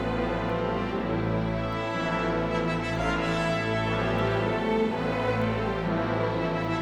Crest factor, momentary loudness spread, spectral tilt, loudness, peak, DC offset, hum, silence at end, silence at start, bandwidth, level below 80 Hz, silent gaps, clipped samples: 14 dB; 2 LU; -7 dB/octave; -27 LUFS; -14 dBFS; under 0.1%; none; 0 s; 0 s; 11 kHz; -42 dBFS; none; under 0.1%